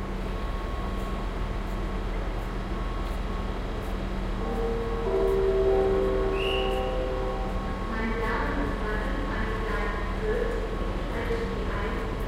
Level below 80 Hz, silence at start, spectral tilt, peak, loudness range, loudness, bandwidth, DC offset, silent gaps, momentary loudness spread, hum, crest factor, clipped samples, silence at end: -32 dBFS; 0 s; -6.5 dB/octave; -14 dBFS; 6 LU; -30 LUFS; 12 kHz; under 0.1%; none; 9 LU; none; 14 dB; under 0.1%; 0 s